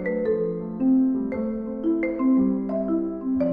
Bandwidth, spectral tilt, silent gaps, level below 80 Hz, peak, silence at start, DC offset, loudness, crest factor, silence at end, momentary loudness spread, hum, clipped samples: 2.7 kHz; -11.5 dB/octave; none; -52 dBFS; -12 dBFS; 0 s; under 0.1%; -24 LUFS; 12 dB; 0 s; 7 LU; none; under 0.1%